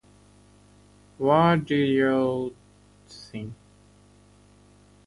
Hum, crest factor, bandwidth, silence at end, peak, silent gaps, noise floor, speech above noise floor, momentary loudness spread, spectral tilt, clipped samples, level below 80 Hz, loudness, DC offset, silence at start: 50 Hz at -50 dBFS; 20 dB; 11.5 kHz; 1.55 s; -8 dBFS; none; -56 dBFS; 33 dB; 20 LU; -7.5 dB/octave; under 0.1%; -60 dBFS; -23 LUFS; under 0.1%; 1.2 s